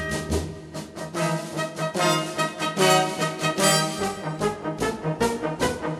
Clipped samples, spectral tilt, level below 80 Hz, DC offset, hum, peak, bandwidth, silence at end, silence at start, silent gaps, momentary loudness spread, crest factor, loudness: under 0.1%; -3.5 dB/octave; -46 dBFS; under 0.1%; none; -4 dBFS; 15.5 kHz; 0 s; 0 s; none; 10 LU; 20 dB; -24 LUFS